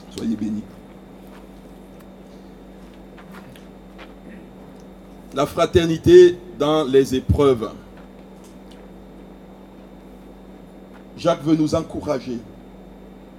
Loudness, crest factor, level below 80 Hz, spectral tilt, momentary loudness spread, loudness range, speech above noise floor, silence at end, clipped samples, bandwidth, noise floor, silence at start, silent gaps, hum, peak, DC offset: -18 LUFS; 22 dB; -42 dBFS; -6.5 dB/octave; 25 LU; 25 LU; 25 dB; 0.85 s; under 0.1%; 14.5 kHz; -42 dBFS; 0.05 s; none; none; 0 dBFS; under 0.1%